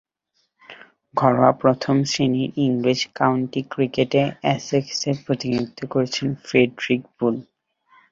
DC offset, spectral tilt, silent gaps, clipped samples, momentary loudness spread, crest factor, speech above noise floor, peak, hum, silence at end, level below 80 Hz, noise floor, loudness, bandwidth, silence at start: under 0.1%; -5.5 dB/octave; none; under 0.1%; 7 LU; 20 dB; 50 dB; 0 dBFS; none; 0.7 s; -60 dBFS; -71 dBFS; -21 LUFS; 7.6 kHz; 0.7 s